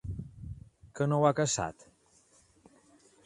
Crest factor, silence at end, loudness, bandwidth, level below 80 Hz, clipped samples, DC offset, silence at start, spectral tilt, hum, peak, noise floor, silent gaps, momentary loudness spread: 24 dB; 1.45 s; -30 LUFS; 11 kHz; -54 dBFS; under 0.1%; under 0.1%; 0.05 s; -5 dB/octave; none; -10 dBFS; -65 dBFS; none; 22 LU